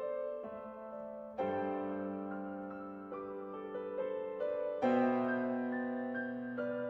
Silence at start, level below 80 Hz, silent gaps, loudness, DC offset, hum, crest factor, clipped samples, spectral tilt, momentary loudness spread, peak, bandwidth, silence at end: 0 s; -76 dBFS; none; -38 LUFS; under 0.1%; none; 18 dB; under 0.1%; -8.5 dB/octave; 13 LU; -20 dBFS; 5.8 kHz; 0 s